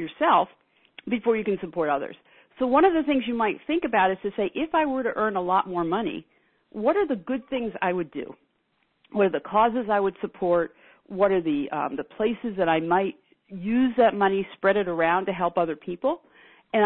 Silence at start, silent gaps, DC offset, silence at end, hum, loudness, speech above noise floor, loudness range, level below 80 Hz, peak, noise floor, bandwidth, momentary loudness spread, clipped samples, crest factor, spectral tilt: 0 s; none; under 0.1%; 0 s; none; -25 LUFS; 47 dB; 3 LU; -58 dBFS; -8 dBFS; -71 dBFS; 4.2 kHz; 11 LU; under 0.1%; 18 dB; -10 dB/octave